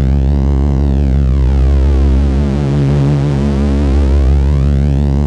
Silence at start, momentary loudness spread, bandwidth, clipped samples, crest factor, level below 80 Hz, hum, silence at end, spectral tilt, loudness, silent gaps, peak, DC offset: 0 s; 2 LU; 6.8 kHz; under 0.1%; 8 dB; -12 dBFS; none; 0 s; -9 dB/octave; -12 LUFS; none; -2 dBFS; under 0.1%